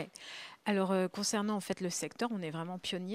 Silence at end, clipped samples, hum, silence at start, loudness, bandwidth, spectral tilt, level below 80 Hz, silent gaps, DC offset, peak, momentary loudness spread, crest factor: 0 s; under 0.1%; none; 0 s; -35 LUFS; 15.5 kHz; -4 dB/octave; -78 dBFS; none; under 0.1%; -18 dBFS; 9 LU; 18 dB